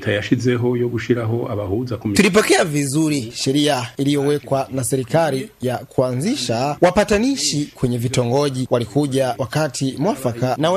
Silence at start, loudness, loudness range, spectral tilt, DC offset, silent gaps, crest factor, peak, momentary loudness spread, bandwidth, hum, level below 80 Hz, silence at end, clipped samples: 0 s; -19 LUFS; 2 LU; -5 dB/octave; under 0.1%; none; 18 dB; 0 dBFS; 6 LU; 15.5 kHz; none; -46 dBFS; 0 s; under 0.1%